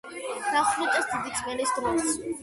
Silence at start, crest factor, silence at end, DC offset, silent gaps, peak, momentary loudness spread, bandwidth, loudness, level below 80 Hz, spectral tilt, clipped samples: 0.05 s; 16 dB; 0 s; under 0.1%; none; -12 dBFS; 6 LU; 12 kHz; -27 LUFS; -58 dBFS; -2 dB/octave; under 0.1%